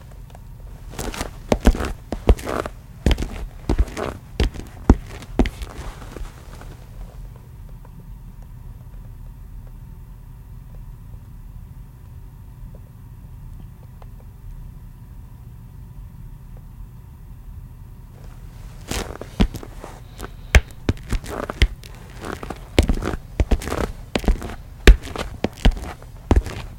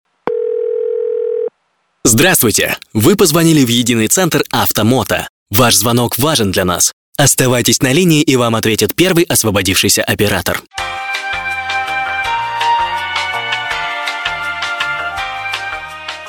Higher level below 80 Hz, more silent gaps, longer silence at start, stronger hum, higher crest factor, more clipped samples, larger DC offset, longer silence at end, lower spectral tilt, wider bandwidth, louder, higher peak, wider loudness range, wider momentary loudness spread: first, -26 dBFS vs -42 dBFS; second, none vs 5.29-5.46 s, 6.93-7.13 s; second, 0 s vs 0.25 s; neither; first, 24 dB vs 14 dB; neither; neither; about the same, 0 s vs 0 s; first, -5.5 dB/octave vs -3.5 dB/octave; second, 17 kHz vs 19.5 kHz; second, -24 LUFS vs -13 LUFS; about the same, 0 dBFS vs 0 dBFS; first, 19 LU vs 6 LU; first, 21 LU vs 10 LU